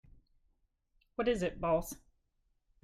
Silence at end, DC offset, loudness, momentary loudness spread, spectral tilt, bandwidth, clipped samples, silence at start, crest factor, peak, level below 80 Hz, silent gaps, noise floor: 0.85 s; under 0.1%; -34 LUFS; 14 LU; -5.5 dB/octave; 15.5 kHz; under 0.1%; 1.2 s; 18 dB; -20 dBFS; -56 dBFS; none; -77 dBFS